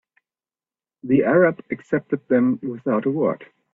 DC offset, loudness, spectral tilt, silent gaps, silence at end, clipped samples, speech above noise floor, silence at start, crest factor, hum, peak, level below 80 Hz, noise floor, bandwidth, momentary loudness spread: under 0.1%; -21 LUFS; -10 dB/octave; none; 0.3 s; under 0.1%; over 70 dB; 1.05 s; 18 dB; none; -4 dBFS; -64 dBFS; under -90 dBFS; 3.7 kHz; 11 LU